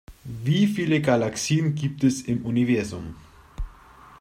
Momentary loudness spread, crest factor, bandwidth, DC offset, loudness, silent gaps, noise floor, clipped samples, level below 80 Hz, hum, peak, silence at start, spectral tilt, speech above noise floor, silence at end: 19 LU; 18 dB; 15.5 kHz; under 0.1%; -23 LUFS; none; -49 dBFS; under 0.1%; -44 dBFS; none; -6 dBFS; 0.1 s; -6 dB/octave; 26 dB; 0.05 s